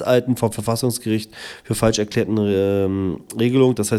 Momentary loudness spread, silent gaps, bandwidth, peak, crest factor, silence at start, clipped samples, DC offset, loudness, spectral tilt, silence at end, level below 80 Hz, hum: 8 LU; none; 16.5 kHz; -2 dBFS; 16 dB; 0 s; under 0.1%; under 0.1%; -20 LUFS; -5.5 dB/octave; 0 s; -48 dBFS; none